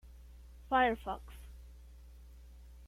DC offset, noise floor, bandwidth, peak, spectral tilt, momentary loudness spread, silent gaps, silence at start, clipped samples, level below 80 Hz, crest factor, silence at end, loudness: under 0.1%; -54 dBFS; 16 kHz; -18 dBFS; -5.5 dB/octave; 27 LU; none; 0.05 s; under 0.1%; -52 dBFS; 20 dB; 0 s; -33 LUFS